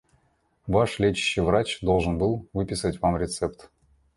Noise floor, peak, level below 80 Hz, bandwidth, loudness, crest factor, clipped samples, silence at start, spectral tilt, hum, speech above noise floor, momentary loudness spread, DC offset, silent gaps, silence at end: -67 dBFS; -8 dBFS; -42 dBFS; 11.5 kHz; -25 LUFS; 18 dB; under 0.1%; 0.65 s; -5.5 dB/octave; none; 43 dB; 7 LU; under 0.1%; none; 0.55 s